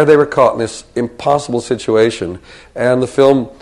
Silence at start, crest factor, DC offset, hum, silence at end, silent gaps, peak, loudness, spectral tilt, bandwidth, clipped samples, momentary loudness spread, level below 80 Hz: 0 s; 14 dB; under 0.1%; none; 0.1 s; none; 0 dBFS; -14 LUFS; -5.5 dB/octave; 11.5 kHz; under 0.1%; 12 LU; -46 dBFS